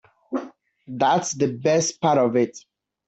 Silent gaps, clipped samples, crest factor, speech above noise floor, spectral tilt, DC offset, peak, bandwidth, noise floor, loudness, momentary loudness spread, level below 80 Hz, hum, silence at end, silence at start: none; under 0.1%; 16 dB; 21 dB; -4.5 dB/octave; under 0.1%; -6 dBFS; 8.2 kHz; -42 dBFS; -22 LUFS; 12 LU; -66 dBFS; none; 0.5 s; 0.3 s